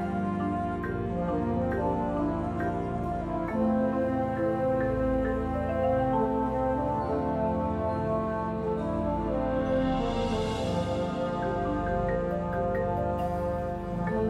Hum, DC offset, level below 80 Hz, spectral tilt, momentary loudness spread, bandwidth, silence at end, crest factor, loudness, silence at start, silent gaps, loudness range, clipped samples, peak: none; under 0.1%; -42 dBFS; -8 dB/octave; 4 LU; 11.5 kHz; 0 s; 12 dB; -29 LUFS; 0 s; none; 2 LU; under 0.1%; -16 dBFS